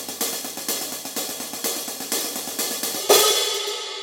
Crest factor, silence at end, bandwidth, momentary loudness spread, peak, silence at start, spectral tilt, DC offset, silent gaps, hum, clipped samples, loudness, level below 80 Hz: 22 dB; 0 s; 17 kHz; 12 LU; -4 dBFS; 0 s; 0.5 dB/octave; under 0.1%; none; none; under 0.1%; -22 LUFS; -72 dBFS